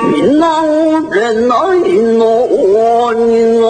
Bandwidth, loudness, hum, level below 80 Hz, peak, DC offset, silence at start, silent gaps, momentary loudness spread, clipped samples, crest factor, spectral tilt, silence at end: 9.4 kHz; -10 LUFS; none; -46 dBFS; 0 dBFS; under 0.1%; 0 s; none; 2 LU; under 0.1%; 10 dB; -5.5 dB/octave; 0 s